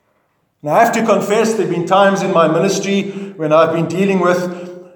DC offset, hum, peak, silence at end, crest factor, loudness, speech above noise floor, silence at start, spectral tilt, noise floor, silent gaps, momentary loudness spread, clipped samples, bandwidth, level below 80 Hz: under 0.1%; none; 0 dBFS; 0.15 s; 14 dB; -14 LUFS; 49 dB; 0.65 s; -5.5 dB/octave; -63 dBFS; none; 10 LU; under 0.1%; 19 kHz; -68 dBFS